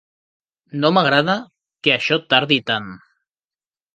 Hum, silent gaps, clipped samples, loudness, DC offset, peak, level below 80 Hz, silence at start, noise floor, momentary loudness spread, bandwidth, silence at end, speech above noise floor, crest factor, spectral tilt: none; none; under 0.1%; -17 LUFS; under 0.1%; 0 dBFS; -64 dBFS; 0.75 s; under -90 dBFS; 9 LU; 9 kHz; 1 s; over 72 dB; 20 dB; -5.5 dB/octave